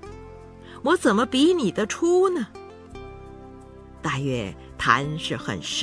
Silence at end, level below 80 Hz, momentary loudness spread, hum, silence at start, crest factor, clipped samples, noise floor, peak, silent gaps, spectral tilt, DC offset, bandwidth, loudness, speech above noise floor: 0 s; -50 dBFS; 23 LU; none; 0 s; 22 dB; under 0.1%; -44 dBFS; -2 dBFS; none; -4.5 dB/octave; under 0.1%; 11 kHz; -23 LUFS; 22 dB